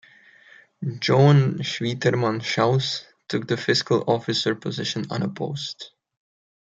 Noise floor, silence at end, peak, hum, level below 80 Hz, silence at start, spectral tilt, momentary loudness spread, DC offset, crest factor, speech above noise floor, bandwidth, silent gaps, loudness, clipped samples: -52 dBFS; 0.9 s; -4 dBFS; none; -64 dBFS; 0.8 s; -5.5 dB/octave; 14 LU; under 0.1%; 20 dB; 30 dB; 7.8 kHz; none; -23 LUFS; under 0.1%